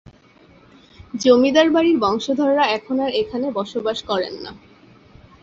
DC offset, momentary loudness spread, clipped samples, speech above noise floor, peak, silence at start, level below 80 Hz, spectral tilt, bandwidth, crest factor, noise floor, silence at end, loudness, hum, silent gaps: under 0.1%; 12 LU; under 0.1%; 32 dB; -2 dBFS; 1 s; -54 dBFS; -4.5 dB/octave; 7.8 kHz; 18 dB; -50 dBFS; 0.85 s; -18 LUFS; none; none